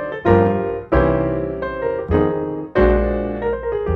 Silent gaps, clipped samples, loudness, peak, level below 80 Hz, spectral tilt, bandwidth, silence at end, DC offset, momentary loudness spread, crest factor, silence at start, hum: none; under 0.1%; -19 LUFS; 0 dBFS; -28 dBFS; -10 dB/octave; 5.2 kHz; 0 s; under 0.1%; 8 LU; 18 dB; 0 s; none